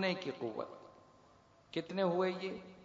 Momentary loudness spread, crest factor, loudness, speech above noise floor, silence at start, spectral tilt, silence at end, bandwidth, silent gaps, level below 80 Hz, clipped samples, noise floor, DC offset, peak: 16 LU; 18 dB; -38 LUFS; 27 dB; 0 s; -4 dB/octave; 0 s; 7.4 kHz; none; -80 dBFS; under 0.1%; -65 dBFS; under 0.1%; -20 dBFS